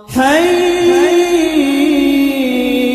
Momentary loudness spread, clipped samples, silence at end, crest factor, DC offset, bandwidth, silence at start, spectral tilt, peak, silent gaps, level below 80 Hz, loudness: 3 LU; under 0.1%; 0 s; 12 dB; under 0.1%; 15 kHz; 0.1 s; -3.5 dB/octave; 0 dBFS; none; -42 dBFS; -11 LUFS